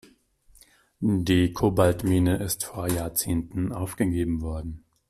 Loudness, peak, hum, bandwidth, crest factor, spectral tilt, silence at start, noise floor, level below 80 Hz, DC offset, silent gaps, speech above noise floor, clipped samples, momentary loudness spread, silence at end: -25 LUFS; -8 dBFS; none; 16 kHz; 18 dB; -5.5 dB/octave; 1 s; -59 dBFS; -44 dBFS; under 0.1%; none; 34 dB; under 0.1%; 9 LU; 0.3 s